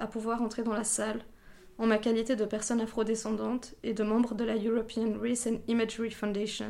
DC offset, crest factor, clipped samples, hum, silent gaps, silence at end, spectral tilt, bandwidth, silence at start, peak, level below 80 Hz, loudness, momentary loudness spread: under 0.1%; 16 dB; under 0.1%; none; none; 0 s; -4 dB/octave; 14 kHz; 0 s; -16 dBFS; -56 dBFS; -31 LUFS; 5 LU